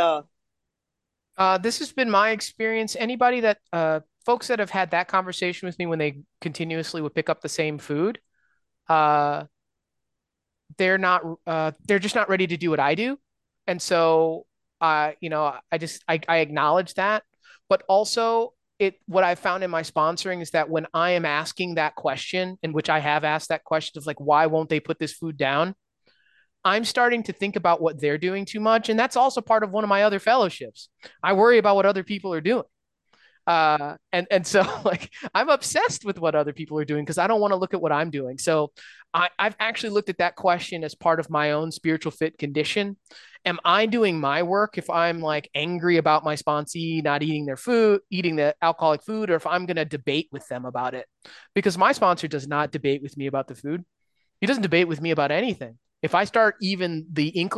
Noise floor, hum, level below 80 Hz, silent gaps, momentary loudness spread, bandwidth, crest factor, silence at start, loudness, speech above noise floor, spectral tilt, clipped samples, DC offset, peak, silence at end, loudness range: -83 dBFS; none; -68 dBFS; none; 9 LU; 12.5 kHz; 18 dB; 0 s; -23 LUFS; 60 dB; -4.5 dB/octave; under 0.1%; under 0.1%; -6 dBFS; 0 s; 3 LU